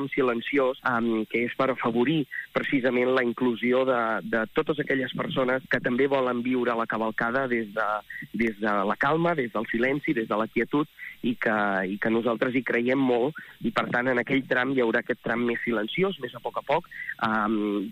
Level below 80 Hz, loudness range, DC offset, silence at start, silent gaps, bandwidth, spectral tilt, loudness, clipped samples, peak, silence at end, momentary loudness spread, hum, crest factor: -62 dBFS; 1 LU; under 0.1%; 0 s; none; 15.5 kHz; -7 dB/octave; -26 LUFS; under 0.1%; -10 dBFS; 0 s; 5 LU; none; 16 dB